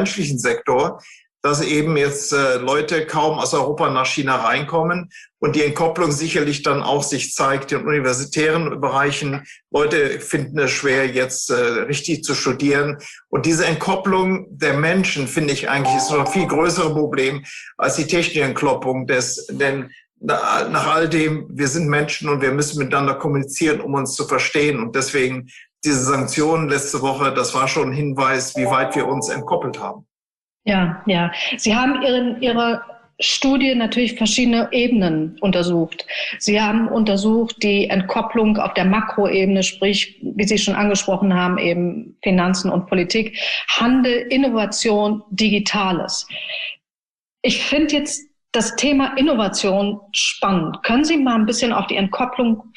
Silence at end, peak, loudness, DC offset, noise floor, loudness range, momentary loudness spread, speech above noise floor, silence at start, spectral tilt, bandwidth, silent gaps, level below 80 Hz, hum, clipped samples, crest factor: 0.1 s; -6 dBFS; -18 LUFS; under 0.1%; under -90 dBFS; 2 LU; 6 LU; over 71 dB; 0 s; -4 dB/octave; 12.5 kHz; 30.14-30.60 s, 46.90-47.26 s, 47.32-47.37 s; -50 dBFS; none; under 0.1%; 12 dB